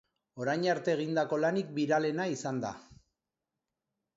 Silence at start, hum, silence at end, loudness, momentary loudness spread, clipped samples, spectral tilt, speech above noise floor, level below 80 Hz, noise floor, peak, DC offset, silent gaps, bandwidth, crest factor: 0.35 s; none; 1.2 s; -32 LUFS; 8 LU; under 0.1%; -5.5 dB/octave; 58 dB; -72 dBFS; -89 dBFS; -16 dBFS; under 0.1%; none; 8 kHz; 18 dB